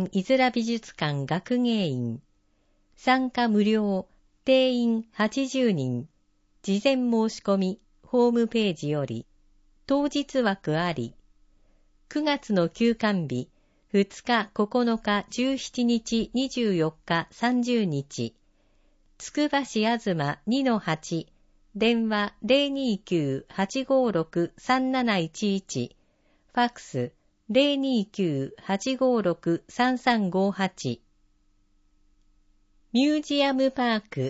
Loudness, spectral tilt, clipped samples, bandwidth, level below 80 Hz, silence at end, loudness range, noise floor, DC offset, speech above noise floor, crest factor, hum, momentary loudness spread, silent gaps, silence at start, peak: -26 LUFS; -5.5 dB/octave; under 0.1%; 8 kHz; -60 dBFS; 0 s; 3 LU; -66 dBFS; under 0.1%; 41 dB; 18 dB; none; 10 LU; none; 0 s; -8 dBFS